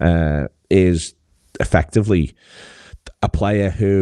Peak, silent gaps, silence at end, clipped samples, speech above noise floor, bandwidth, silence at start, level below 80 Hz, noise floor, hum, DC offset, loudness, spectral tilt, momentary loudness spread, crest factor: 0 dBFS; none; 0 s; under 0.1%; 25 dB; 11 kHz; 0 s; -30 dBFS; -41 dBFS; none; 0.1%; -18 LUFS; -7 dB/octave; 9 LU; 18 dB